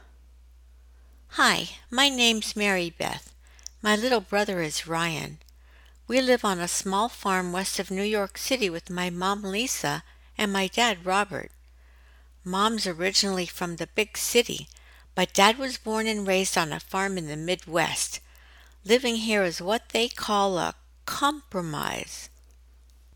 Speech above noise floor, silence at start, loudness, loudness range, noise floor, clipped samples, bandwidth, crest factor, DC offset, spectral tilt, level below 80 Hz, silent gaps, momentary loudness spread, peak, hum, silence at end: 28 dB; 1.3 s; -26 LUFS; 3 LU; -54 dBFS; under 0.1%; 19 kHz; 24 dB; under 0.1%; -3 dB/octave; -54 dBFS; none; 12 LU; -2 dBFS; none; 0.9 s